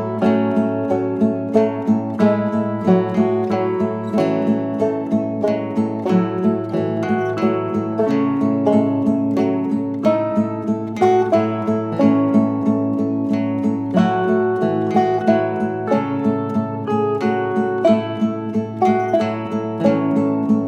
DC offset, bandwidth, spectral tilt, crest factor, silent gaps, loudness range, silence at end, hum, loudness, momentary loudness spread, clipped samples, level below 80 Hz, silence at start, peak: under 0.1%; 8.2 kHz; -8.5 dB/octave; 16 dB; none; 2 LU; 0 s; none; -19 LUFS; 5 LU; under 0.1%; -62 dBFS; 0 s; 0 dBFS